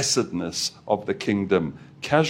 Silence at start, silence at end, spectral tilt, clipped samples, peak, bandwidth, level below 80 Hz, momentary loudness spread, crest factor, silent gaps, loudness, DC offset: 0 s; 0 s; -4 dB/octave; under 0.1%; -4 dBFS; 16.5 kHz; -58 dBFS; 6 LU; 20 dB; none; -25 LUFS; under 0.1%